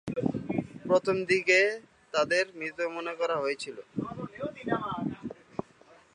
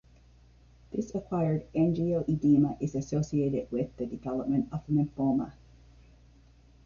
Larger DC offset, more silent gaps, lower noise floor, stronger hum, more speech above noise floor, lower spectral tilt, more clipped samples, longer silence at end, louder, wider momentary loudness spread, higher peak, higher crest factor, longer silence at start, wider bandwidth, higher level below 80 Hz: neither; neither; about the same, -58 dBFS vs -58 dBFS; neither; about the same, 30 dB vs 29 dB; second, -5 dB/octave vs -9 dB/octave; neither; second, 0.55 s vs 1.35 s; about the same, -29 LUFS vs -30 LUFS; first, 16 LU vs 10 LU; first, -10 dBFS vs -14 dBFS; about the same, 20 dB vs 16 dB; second, 0.05 s vs 0.9 s; first, 11 kHz vs 7.2 kHz; second, -64 dBFS vs -54 dBFS